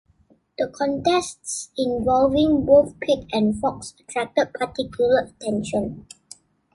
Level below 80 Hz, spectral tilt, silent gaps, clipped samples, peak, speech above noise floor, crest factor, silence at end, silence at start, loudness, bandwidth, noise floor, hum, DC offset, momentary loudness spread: -48 dBFS; -5 dB/octave; none; under 0.1%; -4 dBFS; 38 dB; 18 dB; 0.75 s; 0.6 s; -22 LUFS; 11.5 kHz; -60 dBFS; none; under 0.1%; 13 LU